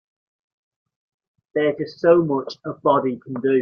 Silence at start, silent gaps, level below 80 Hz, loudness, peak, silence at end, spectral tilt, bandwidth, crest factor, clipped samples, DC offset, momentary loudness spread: 1.55 s; none; -64 dBFS; -21 LUFS; -2 dBFS; 0 s; -8 dB/octave; 6.8 kHz; 20 dB; under 0.1%; under 0.1%; 10 LU